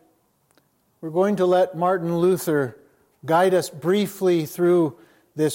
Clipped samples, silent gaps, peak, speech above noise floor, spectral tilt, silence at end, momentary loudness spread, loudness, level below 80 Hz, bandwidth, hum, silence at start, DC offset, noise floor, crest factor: under 0.1%; none; -8 dBFS; 44 dB; -6 dB/octave; 0 s; 9 LU; -21 LUFS; -74 dBFS; 17 kHz; none; 1 s; under 0.1%; -64 dBFS; 14 dB